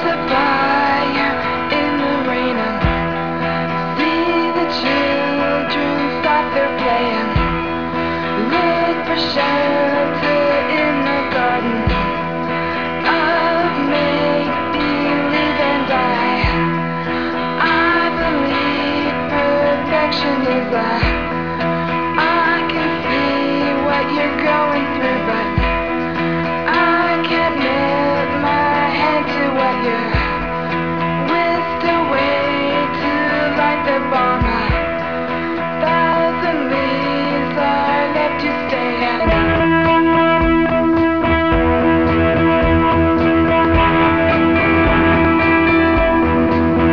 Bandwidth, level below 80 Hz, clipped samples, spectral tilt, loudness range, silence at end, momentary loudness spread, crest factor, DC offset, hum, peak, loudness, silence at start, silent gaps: 5.4 kHz; -32 dBFS; under 0.1%; -7.5 dB/octave; 4 LU; 0 s; 6 LU; 14 dB; 1%; none; -2 dBFS; -16 LUFS; 0 s; none